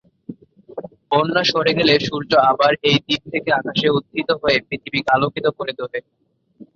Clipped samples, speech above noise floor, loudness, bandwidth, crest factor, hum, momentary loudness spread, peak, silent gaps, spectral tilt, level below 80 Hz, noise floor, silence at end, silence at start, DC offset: under 0.1%; 28 dB; -18 LUFS; 7.4 kHz; 18 dB; none; 19 LU; -2 dBFS; none; -5 dB/octave; -54 dBFS; -47 dBFS; 0.15 s; 0.3 s; under 0.1%